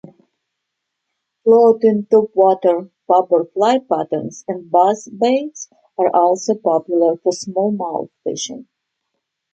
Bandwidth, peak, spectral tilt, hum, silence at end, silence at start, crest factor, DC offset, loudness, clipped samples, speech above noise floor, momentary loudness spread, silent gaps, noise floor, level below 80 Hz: 8.6 kHz; -2 dBFS; -5 dB/octave; none; 0.9 s; 1.45 s; 16 dB; under 0.1%; -16 LUFS; under 0.1%; 61 dB; 13 LU; none; -77 dBFS; -70 dBFS